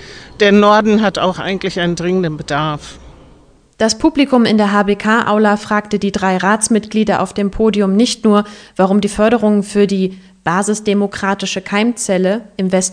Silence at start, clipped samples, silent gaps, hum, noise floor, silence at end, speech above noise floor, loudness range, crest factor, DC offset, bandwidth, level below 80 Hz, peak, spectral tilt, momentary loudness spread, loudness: 0 s; under 0.1%; none; none; -46 dBFS; 0 s; 33 dB; 3 LU; 14 dB; under 0.1%; 10 kHz; -42 dBFS; 0 dBFS; -5 dB/octave; 7 LU; -14 LUFS